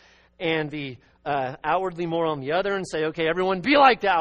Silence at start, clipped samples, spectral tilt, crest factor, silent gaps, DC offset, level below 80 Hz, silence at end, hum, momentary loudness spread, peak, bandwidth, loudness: 0.4 s; under 0.1%; -5.5 dB/octave; 20 dB; none; under 0.1%; -56 dBFS; 0 s; none; 14 LU; -4 dBFS; 8.8 kHz; -23 LUFS